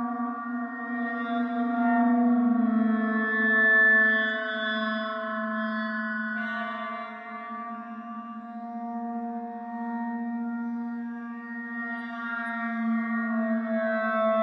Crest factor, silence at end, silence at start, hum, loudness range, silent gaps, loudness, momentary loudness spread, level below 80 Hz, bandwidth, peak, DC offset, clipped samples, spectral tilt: 14 dB; 0 s; 0 s; none; 12 LU; none; -27 LUFS; 14 LU; -82 dBFS; 5.2 kHz; -12 dBFS; under 0.1%; under 0.1%; -7.5 dB/octave